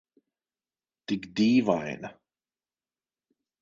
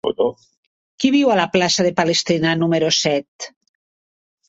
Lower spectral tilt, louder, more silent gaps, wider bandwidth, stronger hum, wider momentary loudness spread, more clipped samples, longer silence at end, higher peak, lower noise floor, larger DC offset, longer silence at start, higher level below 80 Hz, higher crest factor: first, -6 dB/octave vs -4 dB/octave; second, -27 LUFS vs -17 LUFS; second, none vs 0.57-0.98 s, 3.28-3.39 s; about the same, 7.6 kHz vs 8.2 kHz; neither; first, 20 LU vs 8 LU; neither; first, 1.5 s vs 1 s; second, -8 dBFS vs -2 dBFS; about the same, under -90 dBFS vs under -90 dBFS; neither; first, 1.1 s vs 0.05 s; second, -68 dBFS vs -60 dBFS; first, 22 dB vs 16 dB